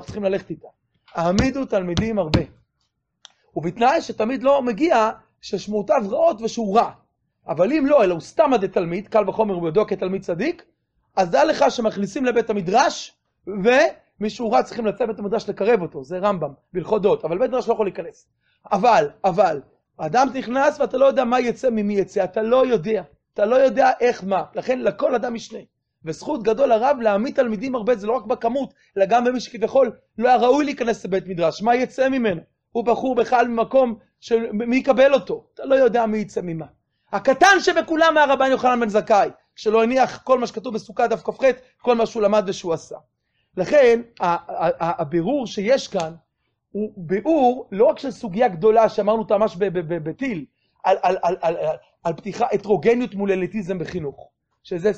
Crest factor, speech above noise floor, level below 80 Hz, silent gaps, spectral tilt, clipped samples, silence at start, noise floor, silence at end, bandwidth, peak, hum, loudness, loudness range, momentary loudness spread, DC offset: 18 dB; 53 dB; -50 dBFS; none; -5.5 dB/octave; under 0.1%; 0 s; -73 dBFS; 0 s; 8.4 kHz; -2 dBFS; none; -20 LUFS; 4 LU; 12 LU; under 0.1%